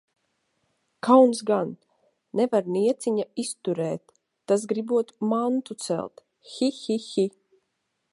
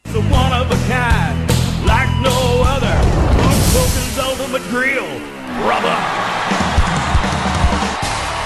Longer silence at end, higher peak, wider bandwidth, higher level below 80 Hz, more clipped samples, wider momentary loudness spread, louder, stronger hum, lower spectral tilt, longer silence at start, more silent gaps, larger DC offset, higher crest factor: first, 0.85 s vs 0 s; about the same, -4 dBFS vs -2 dBFS; second, 11.5 kHz vs 13.5 kHz; second, -76 dBFS vs -22 dBFS; neither; first, 12 LU vs 5 LU; second, -25 LUFS vs -16 LUFS; neither; about the same, -5.5 dB/octave vs -5 dB/octave; first, 1.05 s vs 0.05 s; neither; neither; first, 22 dB vs 12 dB